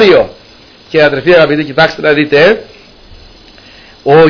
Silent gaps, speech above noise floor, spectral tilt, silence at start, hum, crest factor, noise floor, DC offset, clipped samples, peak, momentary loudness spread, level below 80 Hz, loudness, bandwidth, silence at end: none; 30 dB; -6.5 dB/octave; 0 s; none; 10 dB; -38 dBFS; under 0.1%; 1%; 0 dBFS; 9 LU; -40 dBFS; -9 LUFS; 5.4 kHz; 0 s